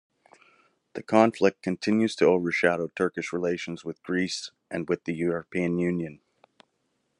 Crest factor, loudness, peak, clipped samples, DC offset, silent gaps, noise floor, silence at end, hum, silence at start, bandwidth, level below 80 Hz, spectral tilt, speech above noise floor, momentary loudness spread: 22 dB; -26 LUFS; -4 dBFS; under 0.1%; under 0.1%; none; -75 dBFS; 1.05 s; none; 0.95 s; 11 kHz; -70 dBFS; -5.5 dB/octave; 49 dB; 13 LU